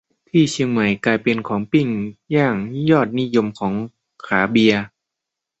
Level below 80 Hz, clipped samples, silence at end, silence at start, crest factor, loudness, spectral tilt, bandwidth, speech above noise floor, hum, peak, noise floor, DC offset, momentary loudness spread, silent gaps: -56 dBFS; under 0.1%; 0.75 s; 0.35 s; 18 dB; -19 LUFS; -6 dB/octave; 8.2 kHz; 65 dB; none; -2 dBFS; -83 dBFS; under 0.1%; 8 LU; none